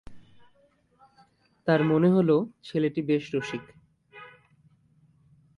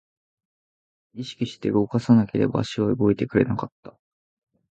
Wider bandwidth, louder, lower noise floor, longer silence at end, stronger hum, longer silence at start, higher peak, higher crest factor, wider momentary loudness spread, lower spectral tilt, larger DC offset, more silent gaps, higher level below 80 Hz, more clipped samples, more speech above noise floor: first, 10.5 kHz vs 8.2 kHz; about the same, -25 LUFS vs -23 LUFS; second, -65 dBFS vs under -90 dBFS; first, 1.3 s vs 0.9 s; neither; second, 0.1 s vs 1.15 s; second, -8 dBFS vs -4 dBFS; about the same, 20 dB vs 20 dB; first, 22 LU vs 13 LU; about the same, -8 dB/octave vs -8 dB/octave; neither; second, none vs 3.72-3.83 s; second, -64 dBFS vs -54 dBFS; neither; second, 40 dB vs over 68 dB